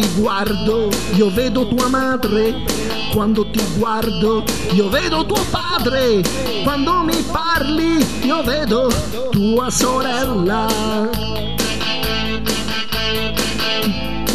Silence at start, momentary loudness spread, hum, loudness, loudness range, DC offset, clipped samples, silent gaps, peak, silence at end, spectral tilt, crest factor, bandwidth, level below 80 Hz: 0 s; 4 LU; none; -17 LUFS; 2 LU; 4%; under 0.1%; none; -2 dBFS; 0 s; -4.5 dB/octave; 16 dB; 14 kHz; -32 dBFS